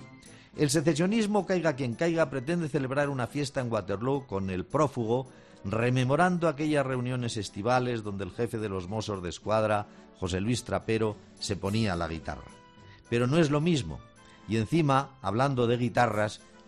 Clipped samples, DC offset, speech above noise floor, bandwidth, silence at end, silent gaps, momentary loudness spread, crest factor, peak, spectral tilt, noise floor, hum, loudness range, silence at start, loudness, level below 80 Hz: under 0.1%; under 0.1%; 25 dB; 12.5 kHz; 0.1 s; none; 9 LU; 18 dB; -10 dBFS; -6 dB/octave; -53 dBFS; none; 3 LU; 0 s; -29 LUFS; -56 dBFS